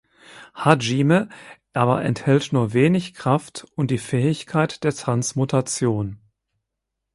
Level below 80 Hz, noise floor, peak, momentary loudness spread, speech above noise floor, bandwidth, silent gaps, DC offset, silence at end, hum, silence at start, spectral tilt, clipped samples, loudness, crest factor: -56 dBFS; -81 dBFS; 0 dBFS; 9 LU; 61 dB; 11.5 kHz; none; under 0.1%; 1 s; none; 0.35 s; -6 dB/octave; under 0.1%; -21 LUFS; 22 dB